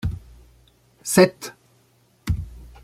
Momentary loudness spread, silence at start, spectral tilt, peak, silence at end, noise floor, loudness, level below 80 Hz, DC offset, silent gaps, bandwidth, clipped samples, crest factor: 22 LU; 0.05 s; -5 dB/octave; -2 dBFS; 0.15 s; -60 dBFS; -21 LUFS; -40 dBFS; under 0.1%; none; 16.5 kHz; under 0.1%; 22 dB